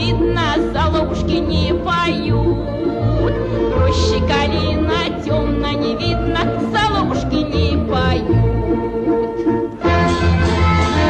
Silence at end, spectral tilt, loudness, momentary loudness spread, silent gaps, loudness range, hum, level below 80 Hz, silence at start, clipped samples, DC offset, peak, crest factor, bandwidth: 0 s; -6.5 dB/octave; -17 LUFS; 4 LU; none; 1 LU; none; -26 dBFS; 0 s; under 0.1%; under 0.1%; -4 dBFS; 12 dB; 8.8 kHz